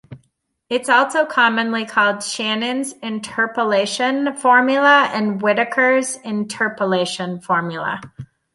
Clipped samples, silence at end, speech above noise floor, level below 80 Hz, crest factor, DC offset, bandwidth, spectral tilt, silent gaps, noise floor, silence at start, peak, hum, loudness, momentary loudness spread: under 0.1%; 0.3 s; 48 dB; -64 dBFS; 16 dB; under 0.1%; 11.5 kHz; -3.5 dB/octave; none; -66 dBFS; 0.1 s; -2 dBFS; none; -18 LUFS; 11 LU